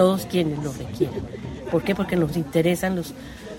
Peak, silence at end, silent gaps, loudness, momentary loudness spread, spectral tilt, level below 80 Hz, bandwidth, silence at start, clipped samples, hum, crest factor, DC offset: -6 dBFS; 0 s; none; -24 LUFS; 12 LU; -6.5 dB/octave; -46 dBFS; 16.5 kHz; 0 s; under 0.1%; none; 18 dB; under 0.1%